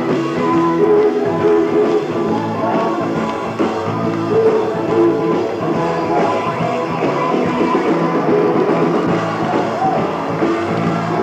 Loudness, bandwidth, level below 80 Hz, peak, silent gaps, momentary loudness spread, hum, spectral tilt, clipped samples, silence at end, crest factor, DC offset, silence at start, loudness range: -16 LUFS; 9 kHz; -56 dBFS; -4 dBFS; none; 5 LU; none; -7 dB/octave; under 0.1%; 0 s; 12 dB; under 0.1%; 0 s; 1 LU